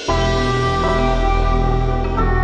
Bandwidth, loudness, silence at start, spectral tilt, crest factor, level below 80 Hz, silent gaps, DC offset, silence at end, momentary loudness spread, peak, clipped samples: 9 kHz; -18 LUFS; 0 s; -6 dB/octave; 12 dB; -20 dBFS; none; under 0.1%; 0 s; 2 LU; -4 dBFS; under 0.1%